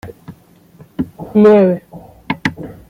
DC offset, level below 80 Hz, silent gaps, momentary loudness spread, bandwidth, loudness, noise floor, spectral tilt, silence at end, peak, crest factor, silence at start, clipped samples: under 0.1%; -48 dBFS; none; 18 LU; 7.6 kHz; -14 LUFS; -45 dBFS; -8 dB/octave; 0.15 s; 0 dBFS; 16 dB; 0.05 s; under 0.1%